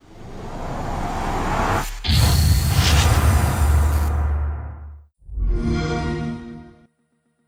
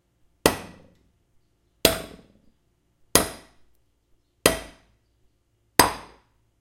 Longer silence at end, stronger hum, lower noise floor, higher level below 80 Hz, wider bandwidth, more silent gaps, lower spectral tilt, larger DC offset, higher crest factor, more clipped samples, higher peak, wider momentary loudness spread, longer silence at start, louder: first, 0.75 s vs 0.6 s; neither; about the same, -67 dBFS vs -68 dBFS; first, -24 dBFS vs -48 dBFS; about the same, 17 kHz vs 16 kHz; neither; first, -5 dB/octave vs -2.5 dB/octave; neither; second, 16 dB vs 28 dB; neither; second, -4 dBFS vs 0 dBFS; about the same, 20 LU vs 20 LU; second, 0.1 s vs 0.45 s; first, -20 LUFS vs -23 LUFS